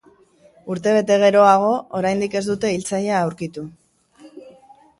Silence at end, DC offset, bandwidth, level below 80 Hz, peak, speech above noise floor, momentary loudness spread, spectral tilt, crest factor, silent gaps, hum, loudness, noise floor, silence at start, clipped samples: 0.5 s; under 0.1%; 11.5 kHz; -60 dBFS; 0 dBFS; 35 dB; 17 LU; -5.5 dB/octave; 20 dB; none; none; -18 LUFS; -53 dBFS; 0.65 s; under 0.1%